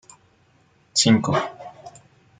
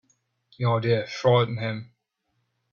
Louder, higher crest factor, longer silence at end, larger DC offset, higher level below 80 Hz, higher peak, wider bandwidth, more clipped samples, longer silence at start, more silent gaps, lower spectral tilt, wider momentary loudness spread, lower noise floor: first, -20 LUFS vs -24 LUFS; about the same, 22 dB vs 18 dB; second, 0.5 s vs 0.9 s; neither; about the same, -60 dBFS vs -62 dBFS; first, -4 dBFS vs -8 dBFS; first, 9.6 kHz vs 7 kHz; neither; first, 0.95 s vs 0.6 s; neither; second, -4 dB/octave vs -7 dB/octave; first, 23 LU vs 10 LU; second, -60 dBFS vs -76 dBFS